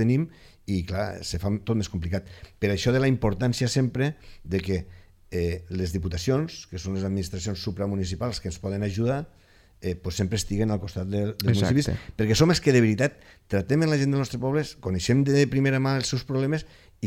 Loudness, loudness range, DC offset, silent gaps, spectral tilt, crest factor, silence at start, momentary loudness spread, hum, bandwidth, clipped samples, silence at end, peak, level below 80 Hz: -26 LUFS; 6 LU; under 0.1%; none; -6 dB/octave; 20 dB; 0 s; 10 LU; none; 15.5 kHz; under 0.1%; 0 s; -4 dBFS; -44 dBFS